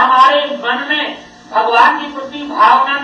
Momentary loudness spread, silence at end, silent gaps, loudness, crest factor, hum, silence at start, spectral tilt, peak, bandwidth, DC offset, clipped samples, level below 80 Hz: 14 LU; 0 s; none; -12 LUFS; 12 dB; none; 0 s; -2.5 dB/octave; 0 dBFS; 9.4 kHz; under 0.1%; under 0.1%; -60 dBFS